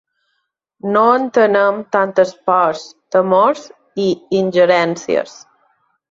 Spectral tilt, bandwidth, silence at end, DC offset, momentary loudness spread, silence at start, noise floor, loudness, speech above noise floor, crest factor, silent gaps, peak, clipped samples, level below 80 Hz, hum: -5.5 dB/octave; 7.6 kHz; 0.8 s; under 0.1%; 10 LU; 0.85 s; -71 dBFS; -15 LUFS; 56 dB; 14 dB; none; -2 dBFS; under 0.1%; -62 dBFS; none